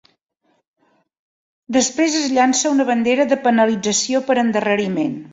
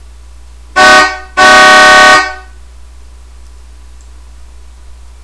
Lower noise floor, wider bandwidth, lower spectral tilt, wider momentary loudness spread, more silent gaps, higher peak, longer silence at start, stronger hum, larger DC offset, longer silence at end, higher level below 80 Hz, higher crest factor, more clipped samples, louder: first, -66 dBFS vs -33 dBFS; second, 8 kHz vs 11 kHz; first, -3 dB/octave vs -1 dB/octave; second, 4 LU vs 11 LU; neither; about the same, -2 dBFS vs 0 dBFS; first, 1.7 s vs 0.75 s; neither; neither; second, 0.05 s vs 2.85 s; second, -62 dBFS vs -32 dBFS; first, 16 dB vs 8 dB; second, under 0.1% vs 3%; second, -17 LUFS vs -3 LUFS